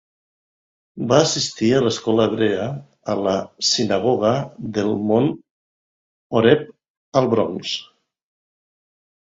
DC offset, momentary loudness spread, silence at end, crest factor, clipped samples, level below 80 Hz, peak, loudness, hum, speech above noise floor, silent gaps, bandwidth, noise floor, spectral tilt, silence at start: under 0.1%; 10 LU; 1.55 s; 20 dB; under 0.1%; -56 dBFS; 0 dBFS; -20 LUFS; none; over 71 dB; 5.51-6.30 s, 6.90-7.12 s; 7.8 kHz; under -90 dBFS; -4.5 dB/octave; 0.95 s